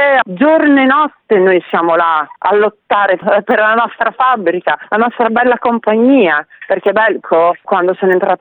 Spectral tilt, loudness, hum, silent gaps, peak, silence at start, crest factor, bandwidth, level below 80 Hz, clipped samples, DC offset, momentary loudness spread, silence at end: -8.5 dB/octave; -12 LUFS; none; none; 0 dBFS; 0 s; 12 dB; 4.3 kHz; -58 dBFS; under 0.1%; under 0.1%; 5 LU; 0.05 s